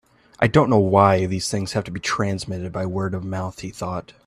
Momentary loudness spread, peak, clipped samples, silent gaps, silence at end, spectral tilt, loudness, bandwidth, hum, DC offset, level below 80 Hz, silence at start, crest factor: 13 LU; 0 dBFS; under 0.1%; none; 0.15 s; -6 dB/octave; -21 LUFS; 13.5 kHz; none; under 0.1%; -50 dBFS; 0.4 s; 20 dB